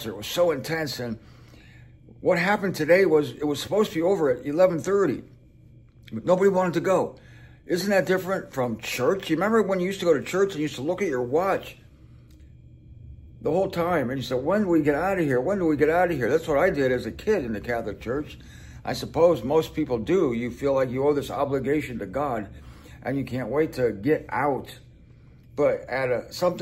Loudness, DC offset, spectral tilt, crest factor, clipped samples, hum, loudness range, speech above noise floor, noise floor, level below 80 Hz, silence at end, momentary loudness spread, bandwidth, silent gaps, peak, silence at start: -24 LUFS; under 0.1%; -6 dB/octave; 18 dB; under 0.1%; none; 5 LU; 27 dB; -51 dBFS; -50 dBFS; 0 s; 10 LU; 16 kHz; none; -6 dBFS; 0 s